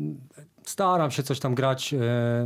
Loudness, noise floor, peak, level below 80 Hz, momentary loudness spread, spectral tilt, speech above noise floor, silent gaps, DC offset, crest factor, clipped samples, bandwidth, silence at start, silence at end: -26 LUFS; -49 dBFS; -10 dBFS; -66 dBFS; 13 LU; -5.5 dB/octave; 25 dB; none; under 0.1%; 16 dB; under 0.1%; 15.5 kHz; 0 s; 0 s